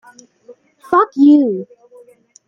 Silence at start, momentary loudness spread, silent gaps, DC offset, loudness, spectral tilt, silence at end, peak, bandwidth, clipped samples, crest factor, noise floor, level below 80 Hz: 0.5 s; 10 LU; none; under 0.1%; -13 LUFS; -7 dB/octave; 0.85 s; -2 dBFS; 7 kHz; under 0.1%; 14 dB; -46 dBFS; -64 dBFS